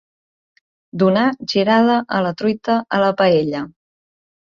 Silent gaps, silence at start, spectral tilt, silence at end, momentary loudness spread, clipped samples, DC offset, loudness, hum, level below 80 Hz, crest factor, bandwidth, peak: none; 0.95 s; -6.5 dB/octave; 0.9 s; 10 LU; under 0.1%; under 0.1%; -17 LUFS; none; -60 dBFS; 16 dB; 7.2 kHz; -2 dBFS